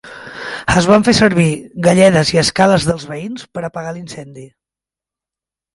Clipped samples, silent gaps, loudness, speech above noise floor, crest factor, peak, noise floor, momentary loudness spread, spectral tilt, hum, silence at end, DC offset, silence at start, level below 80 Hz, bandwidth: under 0.1%; none; -13 LUFS; 75 dB; 16 dB; 0 dBFS; -88 dBFS; 18 LU; -5 dB/octave; none; 1.3 s; under 0.1%; 0.05 s; -40 dBFS; 11.5 kHz